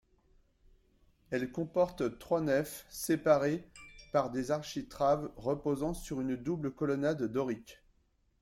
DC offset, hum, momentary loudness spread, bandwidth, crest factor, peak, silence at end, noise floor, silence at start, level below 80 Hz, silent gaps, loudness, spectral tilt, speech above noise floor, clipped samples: under 0.1%; none; 10 LU; 16.5 kHz; 20 dB; -14 dBFS; 0.7 s; -72 dBFS; 1.3 s; -58 dBFS; none; -34 LUFS; -6 dB/octave; 39 dB; under 0.1%